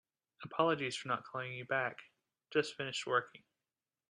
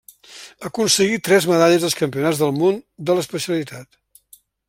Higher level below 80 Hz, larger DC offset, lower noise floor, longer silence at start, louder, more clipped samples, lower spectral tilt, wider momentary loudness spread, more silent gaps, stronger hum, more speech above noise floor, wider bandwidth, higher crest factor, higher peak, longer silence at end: second, -82 dBFS vs -62 dBFS; neither; first, under -90 dBFS vs -52 dBFS; about the same, 0.4 s vs 0.3 s; second, -37 LUFS vs -18 LUFS; neither; about the same, -4 dB/octave vs -4 dB/octave; second, 12 LU vs 18 LU; neither; neither; first, over 53 dB vs 34 dB; second, 11.5 kHz vs 16.5 kHz; about the same, 22 dB vs 18 dB; second, -18 dBFS vs -2 dBFS; second, 0.7 s vs 0.85 s